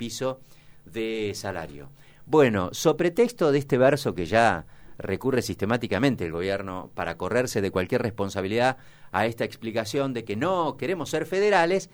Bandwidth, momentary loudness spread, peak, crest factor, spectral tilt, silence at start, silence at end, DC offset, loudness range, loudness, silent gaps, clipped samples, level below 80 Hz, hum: over 20 kHz; 11 LU; -6 dBFS; 20 dB; -5.5 dB/octave; 0 s; 0.1 s; under 0.1%; 4 LU; -25 LUFS; none; under 0.1%; -54 dBFS; none